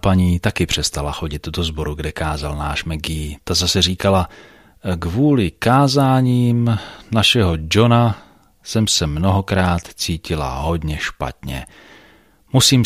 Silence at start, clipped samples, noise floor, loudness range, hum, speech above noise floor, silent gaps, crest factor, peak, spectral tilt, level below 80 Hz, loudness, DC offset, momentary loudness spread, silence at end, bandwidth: 0.05 s; under 0.1%; -51 dBFS; 6 LU; none; 33 dB; none; 18 dB; 0 dBFS; -5 dB/octave; -32 dBFS; -18 LUFS; under 0.1%; 11 LU; 0 s; 15.5 kHz